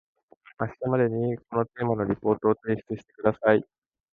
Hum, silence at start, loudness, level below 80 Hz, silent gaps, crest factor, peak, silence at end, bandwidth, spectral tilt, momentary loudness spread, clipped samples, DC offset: none; 0.6 s; -26 LUFS; -58 dBFS; none; 22 dB; -4 dBFS; 0.5 s; 4.1 kHz; -10.5 dB/octave; 8 LU; under 0.1%; under 0.1%